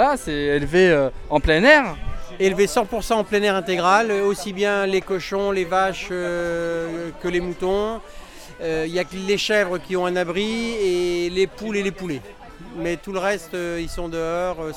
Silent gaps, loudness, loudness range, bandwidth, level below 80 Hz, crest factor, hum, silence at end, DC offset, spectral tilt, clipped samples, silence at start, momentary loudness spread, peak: none; -21 LUFS; 7 LU; 16 kHz; -38 dBFS; 20 dB; none; 0 s; under 0.1%; -4.5 dB/octave; under 0.1%; 0 s; 12 LU; -2 dBFS